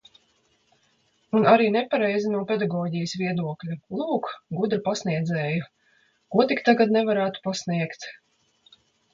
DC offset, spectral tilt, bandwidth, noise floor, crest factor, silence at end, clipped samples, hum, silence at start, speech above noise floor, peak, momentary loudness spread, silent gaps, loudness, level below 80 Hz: under 0.1%; -6 dB/octave; 7.6 kHz; -66 dBFS; 20 dB; 1 s; under 0.1%; none; 1.35 s; 43 dB; -4 dBFS; 12 LU; none; -24 LUFS; -68 dBFS